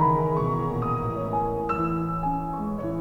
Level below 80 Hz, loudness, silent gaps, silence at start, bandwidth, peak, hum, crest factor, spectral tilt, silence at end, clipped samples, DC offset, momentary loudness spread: -42 dBFS; -26 LUFS; none; 0 s; 7.4 kHz; -8 dBFS; none; 16 dB; -10 dB/octave; 0 s; under 0.1%; under 0.1%; 5 LU